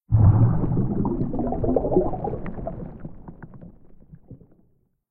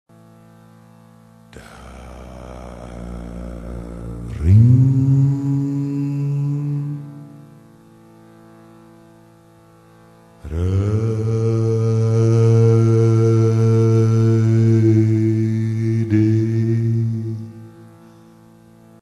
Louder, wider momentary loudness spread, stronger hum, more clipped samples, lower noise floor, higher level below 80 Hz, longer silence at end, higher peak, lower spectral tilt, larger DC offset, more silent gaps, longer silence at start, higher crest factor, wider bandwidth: second, -23 LUFS vs -17 LUFS; first, 25 LU vs 22 LU; neither; neither; first, -63 dBFS vs -48 dBFS; first, -34 dBFS vs -40 dBFS; second, 0.75 s vs 1.2 s; about the same, -4 dBFS vs -2 dBFS; first, -15 dB/octave vs -9.5 dB/octave; neither; neither; second, 0.1 s vs 1.55 s; about the same, 20 dB vs 16 dB; second, 2.5 kHz vs 7.2 kHz